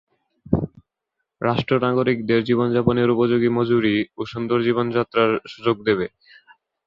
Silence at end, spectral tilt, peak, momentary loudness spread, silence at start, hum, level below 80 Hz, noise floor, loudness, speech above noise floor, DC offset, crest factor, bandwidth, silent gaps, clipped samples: 0.8 s; -8.5 dB/octave; -2 dBFS; 6 LU; 0.45 s; none; -48 dBFS; -80 dBFS; -21 LUFS; 60 dB; under 0.1%; 18 dB; 6.6 kHz; none; under 0.1%